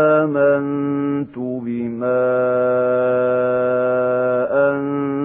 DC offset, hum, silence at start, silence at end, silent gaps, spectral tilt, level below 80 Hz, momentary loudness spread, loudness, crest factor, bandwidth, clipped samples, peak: under 0.1%; none; 0 s; 0 s; none; -12 dB/octave; -62 dBFS; 8 LU; -18 LUFS; 12 dB; 3.7 kHz; under 0.1%; -4 dBFS